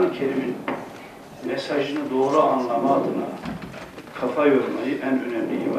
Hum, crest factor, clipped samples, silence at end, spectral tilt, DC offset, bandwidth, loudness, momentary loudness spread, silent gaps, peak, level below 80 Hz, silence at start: none; 18 dB; under 0.1%; 0 s; -6.5 dB/octave; under 0.1%; 14.5 kHz; -23 LUFS; 17 LU; none; -4 dBFS; -60 dBFS; 0 s